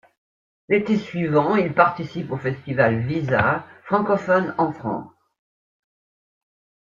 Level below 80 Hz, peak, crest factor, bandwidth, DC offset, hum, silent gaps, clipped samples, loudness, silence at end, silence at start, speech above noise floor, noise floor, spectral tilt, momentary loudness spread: -58 dBFS; -2 dBFS; 22 dB; 7.4 kHz; under 0.1%; none; none; under 0.1%; -21 LUFS; 1.8 s; 0.7 s; over 69 dB; under -90 dBFS; -8.5 dB/octave; 9 LU